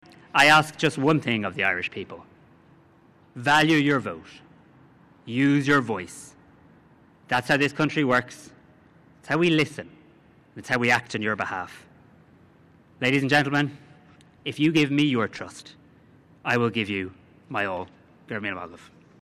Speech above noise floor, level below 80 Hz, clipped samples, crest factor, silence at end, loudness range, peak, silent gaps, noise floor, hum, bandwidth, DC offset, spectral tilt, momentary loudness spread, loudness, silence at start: 33 dB; -62 dBFS; under 0.1%; 18 dB; 0.5 s; 4 LU; -8 dBFS; none; -56 dBFS; none; 14 kHz; under 0.1%; -5 dB/octave; 20 LU; -23 LUFS; 0.35 s